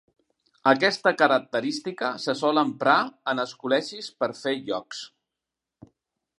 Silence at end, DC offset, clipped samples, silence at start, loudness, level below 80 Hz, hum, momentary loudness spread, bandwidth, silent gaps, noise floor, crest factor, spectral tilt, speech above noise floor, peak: 1.3 s; under 0.1%; under 0.1%; 0.65 s; -24 LUFS; -76 dBFS; none; 11 LU; 11.5 kHz; none; -87 dBFS; 22 dB; -4 dB/octave; 62 dB; -4 dBFS